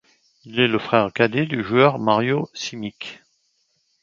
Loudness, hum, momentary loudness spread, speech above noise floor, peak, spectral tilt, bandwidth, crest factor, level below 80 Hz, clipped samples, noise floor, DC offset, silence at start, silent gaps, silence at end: -20 LUFS; none; 15 LU; 47 dB; 0 dBFS; -5.5 dB/octave; 7.6 kHz; 22 dB; -60 dBFS; under 0.1%; -67 dBFS; under 0.1%; 0.45 s; none; 0.9 s